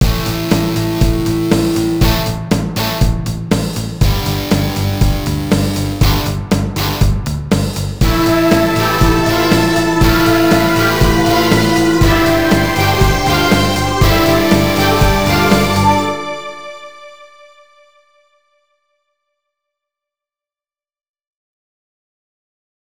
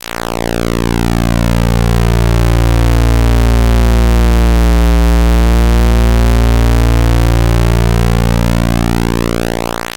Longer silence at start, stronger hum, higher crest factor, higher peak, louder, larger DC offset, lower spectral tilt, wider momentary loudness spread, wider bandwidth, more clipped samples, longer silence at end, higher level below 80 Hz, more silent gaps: second, 0 s vs 0.2 s; neither; first, 14 dB vs 8 dB; about the same, 0 dBFS vs 0 dBFS; about the same, -13 LUFS vs -12 LUFS; neither; about the same, -5.5 dB/octave vs -6.5 dB/octave; about the same, 6 LU vs 4 LU; first, over 20 kHz vs 17 kHz; neither; first, 5.65 s vs 0.05 s; second, -22 dBFS vs -12 dBFS; neither